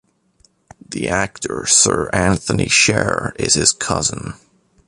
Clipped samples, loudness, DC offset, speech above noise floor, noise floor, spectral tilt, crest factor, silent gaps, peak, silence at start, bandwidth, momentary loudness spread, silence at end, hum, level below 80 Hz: under 0.1%; -16 LUFS; under 0.1%; 40 dB; -58 dBFS; -2.5 dB/octave; 18 dB; none; 0 dBFS; 0.9 s; 11.5 kHz; 12 LU; 0.5 s; none; -40 dBFS